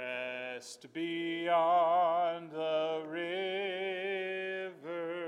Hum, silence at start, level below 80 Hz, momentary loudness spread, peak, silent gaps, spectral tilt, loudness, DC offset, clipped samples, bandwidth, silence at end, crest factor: none; 0 s; under -90 dBFS; 13 LU; -20 dBFS; none; -4.5 dB/octave; -34 LUFS; under 0.1%; under 0.1%; 11 kHz; 0 s; 14 dB